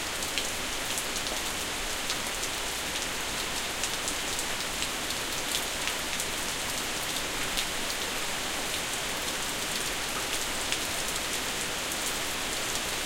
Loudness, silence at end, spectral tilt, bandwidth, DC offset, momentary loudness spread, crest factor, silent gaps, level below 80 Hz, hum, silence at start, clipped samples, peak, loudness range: -30 LUFS; 0 s; -1 dB/octave; 17 kHz; under 0.1%; 1 LU; 26 dB; none; -48 dBFS; none; 0 s; under 0.1%; -6 dBFS; 1 LU